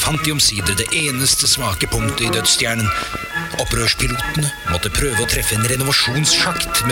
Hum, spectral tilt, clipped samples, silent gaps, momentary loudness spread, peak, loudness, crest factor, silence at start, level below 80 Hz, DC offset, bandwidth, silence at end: none; -2.5 dB/octave; under 0.1%; none; 6 LU; -2 dBFS; -16 LUFS; 16 dB; 0 s; -32 dBFS; under 0.1%; 17.5 kHz; 0 s